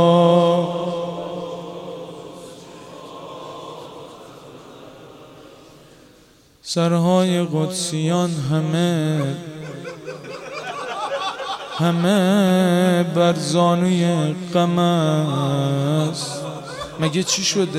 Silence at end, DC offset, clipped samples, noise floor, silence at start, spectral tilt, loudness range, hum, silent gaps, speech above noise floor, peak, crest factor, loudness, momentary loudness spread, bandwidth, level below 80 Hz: 0 s; under 0.1%; under 0.1%; -52 dBFS; 0 s; -5.5 dB/octave; 20 LU; none; none; 34 dB; -4 dBFS; 16 dB; -19 LUFS; 21 LU; 13.5 kHz; -60 dBFS